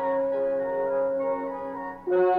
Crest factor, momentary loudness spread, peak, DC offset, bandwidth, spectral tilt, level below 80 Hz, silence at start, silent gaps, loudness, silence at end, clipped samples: 12 dB; 8 LU; -14 dBFS; under 0.1%; 4.3 kHz; -8.5 dB/octave; -62 dBFS; 0 s; none; -27 LUFS; 0 s; under 0.1%